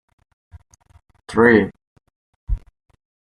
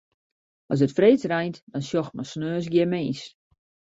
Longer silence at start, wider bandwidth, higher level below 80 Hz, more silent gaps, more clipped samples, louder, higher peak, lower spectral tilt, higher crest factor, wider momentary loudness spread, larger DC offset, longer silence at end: first, 1.3 s vs 0.7 s; first, 9.8 kHz vs 8 kHz; first, -36 dBFS vs -64 dBFS; first, 1.87-1.96 s, 2.16-2.47 s vs 1.62-1.67 s; neither; first, -18 LUFS vs -24 LUFS; first, -2 dBFS vs -6 dBFS; about the same, -7 dB/octave vs -7 dB/octave; about the same, 20 dB vs 20 dB; first, 17 LU vs 14 LU; neither; first, 0.8 s vs 0.6 s